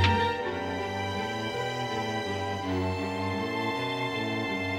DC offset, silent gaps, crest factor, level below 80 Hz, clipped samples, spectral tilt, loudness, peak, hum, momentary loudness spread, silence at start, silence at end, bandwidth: under 0.1%; none; 18 dB; -60 dBFS; under 0.1%; -5.5 dB/octave; -30 LUFS; -10 dBFS; none; 3 LU; 0 s; 0 s; 15.5 kHz